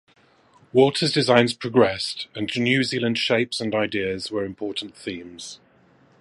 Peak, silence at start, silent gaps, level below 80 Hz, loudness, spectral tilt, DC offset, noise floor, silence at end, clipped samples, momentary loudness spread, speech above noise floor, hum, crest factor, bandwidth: 0 dBFS; 0.75 s; none; -60 dBFS; -22 LUFS; -5 dB/octave; under 0.1%; -57 dBFS; 0.65 s; under 0.1%; 15 LU; 34 dB; none; 22 dB; 11.5 kHz